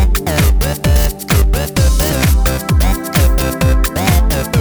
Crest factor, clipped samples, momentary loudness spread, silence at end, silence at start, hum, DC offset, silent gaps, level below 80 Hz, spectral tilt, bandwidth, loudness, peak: 12 dB; under 0.1%; 2 LU; 0 s; 0 s; none; under 0.1%; none; -14 dBFS; -5 dB/octave; over 20 kHz; -14 LUFS; 0 dBFS